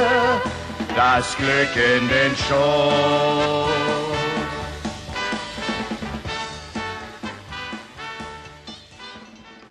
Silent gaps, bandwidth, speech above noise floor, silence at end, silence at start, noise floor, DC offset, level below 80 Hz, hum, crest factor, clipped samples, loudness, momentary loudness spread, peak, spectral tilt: none; 12.5 kHz; 25 dB; 0.05 s; 0 s; -44 dBFS; under 0.1%; -44 dBFS; none; 16 dB; under 0.1%; -21 LUFS; 18 LU; -6 dBFS; -4.5 dB/octave